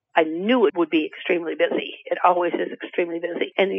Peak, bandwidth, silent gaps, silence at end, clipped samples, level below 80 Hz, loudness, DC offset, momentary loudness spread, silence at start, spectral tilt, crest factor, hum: -4 dBFS; 5.6 kHz; none; 0 s; under 0.1%; -82 dBFS; -22 LUFS; under 0.1%; 8 LU; 0.15 s; -7.5 dB/octave; 18 dB; none